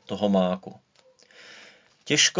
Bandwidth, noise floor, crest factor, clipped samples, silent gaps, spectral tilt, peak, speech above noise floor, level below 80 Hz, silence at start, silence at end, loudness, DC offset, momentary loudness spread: 7.6 kHz; -58 dBFS; 20 dB; under 0.1%; none; -3 dB/octave; -8 dBFS; 34 dB; -64 dBFS; 0.1 s; 0 s; -24 LUFS; under 0.1%; 25 LU